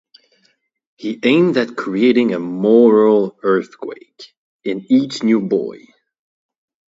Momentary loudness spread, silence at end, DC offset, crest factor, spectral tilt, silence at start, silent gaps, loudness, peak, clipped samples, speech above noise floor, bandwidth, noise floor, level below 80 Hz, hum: 18 LU; 1.15 s; under 0.1%; 16 dB; -6.5 dB/octave; 1 s; 4.37-4.59 s; -15 LUFS; 0 dBFS; under 0.1%; 47 dB; 7.8 kHz; -62 dBFS; -66 dBFS; none